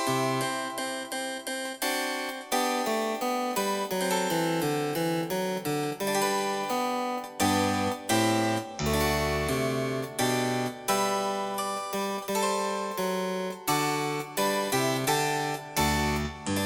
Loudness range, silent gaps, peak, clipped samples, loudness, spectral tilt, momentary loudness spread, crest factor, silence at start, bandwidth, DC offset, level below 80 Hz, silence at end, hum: 2 LU; none; -12 dBFS; under 0.1%; -28 LUFS; -4 dB/octave; 5 LU; 16 dB; 0 s; over 20 kHz; under 0.1%; -48 dBFS; 0 s; none